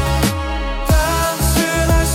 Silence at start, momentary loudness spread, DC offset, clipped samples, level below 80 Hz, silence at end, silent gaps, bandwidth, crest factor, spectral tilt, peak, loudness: 0 s; 7 LU; under 0.1%; under 0.1%; -20 dBFS; 0 s; none; 17 kHz; 14 dB; -4.5 dB/octave; -2 dBFS; -17 LUFS